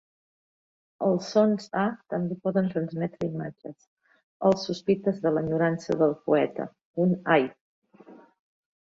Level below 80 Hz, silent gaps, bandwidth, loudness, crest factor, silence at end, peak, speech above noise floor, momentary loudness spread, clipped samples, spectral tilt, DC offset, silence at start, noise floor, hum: -66 dBFS; 3.87-3.97 s, 4.23-4.40 s, 6.85-6.94 s, 7.61-7.82 s; 7.8 kHz; -26 LUFS; 20 dB; 0.7 s; -8 dBFS; 26 dB; 10 LU; under 0.1%; -7 dB/octave; under 0.1%; 1 s; -52 dBFS; none